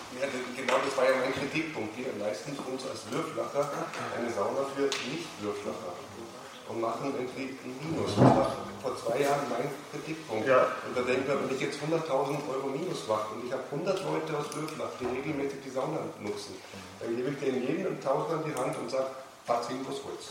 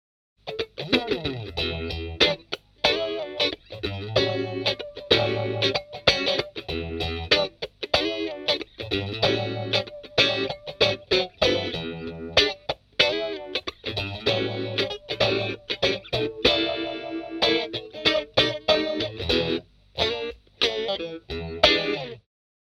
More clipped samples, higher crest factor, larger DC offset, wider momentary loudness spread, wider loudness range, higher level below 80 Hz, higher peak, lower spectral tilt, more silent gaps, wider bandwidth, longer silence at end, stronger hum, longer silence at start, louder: neither; about the same, 24 dB vs 26 dB; neither; about the same, 12 LU vs 11 LU; first, 5 LU vs 2 LU; second, -66 dBFS vs -48 dBFS; second, -8 dBFS vs 0 dBFS; about the same, -5 dB/octave vs -4.5 dB/octave; neither; about the same, 16 kHz vs 15.5 kHz; second, 0 s vs 0.5 s; neither; second, 0 s vs 0.45 s; second, -32 LUFS vs -24 LUFS